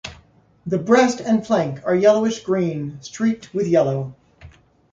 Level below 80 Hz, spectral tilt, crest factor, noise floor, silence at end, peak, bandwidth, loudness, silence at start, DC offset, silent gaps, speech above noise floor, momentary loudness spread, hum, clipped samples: -56 dBFS; -6 dB/octave; 18 dB; -53 dBFS; 0.45 s; -2 dBFS; 7.8 kHz; -19 LUFS; 0.05 s; under 0.1%; none; 34 dB; 14 LU; none; under 0.1%